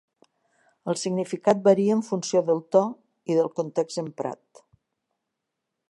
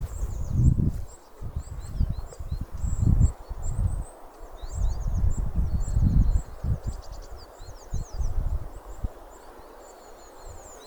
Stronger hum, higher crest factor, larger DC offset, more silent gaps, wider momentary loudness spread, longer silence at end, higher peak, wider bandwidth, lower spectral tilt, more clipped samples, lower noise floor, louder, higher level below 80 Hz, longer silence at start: neither; about the same, 20 dB vs 20 dB; neither; neither; second, 14 LU vs 23 LU; first, 1.55 s vs 0 s; about the same, -6 dBFS vs -6 dBFS; second, 11.5 kHz vs 20 kHz; second, -6 dB/octave vs -7.5 dB/octave; neither; first, -83 dBFS vs -46 dBFS; first, -24 LUFS vs -29 LUFS; second, -78 dBFS vs -30 dBFS; first, 0.85 s vs 0 s